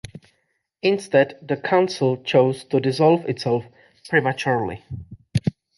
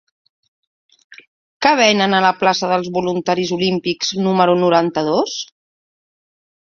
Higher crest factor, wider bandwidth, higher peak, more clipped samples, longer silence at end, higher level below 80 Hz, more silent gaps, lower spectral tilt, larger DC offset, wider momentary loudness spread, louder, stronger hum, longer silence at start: about the same, 18 dB vs 18 dB; first, 11.5 kHz vs 7.2 kHz; second, -4 dBFS vs 0 dBFS; neither; second, 0.25 s vs 1.2 s; first, -52 dBFS vs -60 dBFS; second, none vs 1.27-1.60 s; first, -6.5 dB/octave vs -4.5 dB/octave; neither; first, 10 LU vs 7 LU; second, -21 LUFS vs -16 LUFS; neither; second, 0.15 s vs 1.1 s